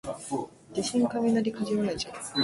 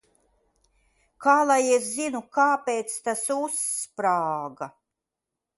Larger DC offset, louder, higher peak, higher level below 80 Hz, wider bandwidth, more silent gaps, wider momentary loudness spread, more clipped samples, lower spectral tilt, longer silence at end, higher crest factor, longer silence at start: neither; second, -29 LUFS vs -24 LUFS; second, -14 dBFS vs -6 dBFS; first, -60 dBFS vs -74 dBFS; about the same, 11.5 kHz vs 12 kHz; neither; about the same, 9 LU vs 10 LU; neither; first, -4.5 dB/octave vs -2.5 dB/octave; second, 0 s vs 0.9 s; about the same, 16 dB vs 20 dB; second, 0.05 s vs 1.2 s